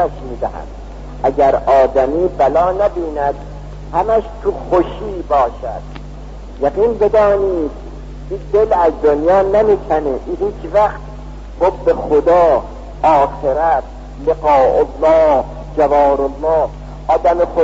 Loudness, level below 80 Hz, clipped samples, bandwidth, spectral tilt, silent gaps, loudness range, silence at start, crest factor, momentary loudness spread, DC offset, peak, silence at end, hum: -14 LUFS; -30 dBFS; under 0.1%; 7.8 kHz; -7.5 dB/octave; none; 4 LU; 0 s; 12 dB; 20 LU; under 0.1%; -2 dBFS; 0 s; 50 Hz at -30 dBFS